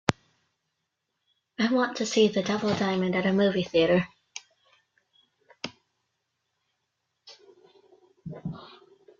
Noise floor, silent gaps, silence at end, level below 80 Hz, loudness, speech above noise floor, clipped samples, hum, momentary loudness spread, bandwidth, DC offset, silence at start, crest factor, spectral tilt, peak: -81 dBFS; none; 0.5 s; -64 dBFS; -25 LUFS; 57 dB; under 0.1%; none; 21 LU; 8.4 kHz; under 0.1%; 0.1 s; 28 dB; -5 dB/octave; -2 dBFS